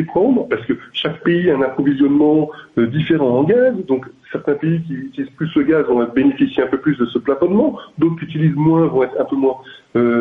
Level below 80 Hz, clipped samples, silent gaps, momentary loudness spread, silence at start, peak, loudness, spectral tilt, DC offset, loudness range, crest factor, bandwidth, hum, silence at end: -54 dBFS; under 0.1%; none; 8 LU; 0 s; -4 dBFS; -17 LUFS; -9.5 dB/octave; under 0.1%; 2 LU; 12 dB; 3.9 kHz; none; 0 s